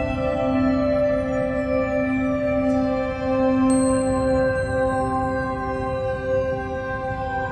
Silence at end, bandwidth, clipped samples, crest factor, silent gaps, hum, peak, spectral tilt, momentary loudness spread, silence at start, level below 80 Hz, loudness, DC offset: 0 s; 9 kHz; under 0.1%; 12 dB; none; none; -8 dBFS; -6.5 dB/octave; 7 LU; 0 s; -38 dBFS; -22 LUFS; under 0.1%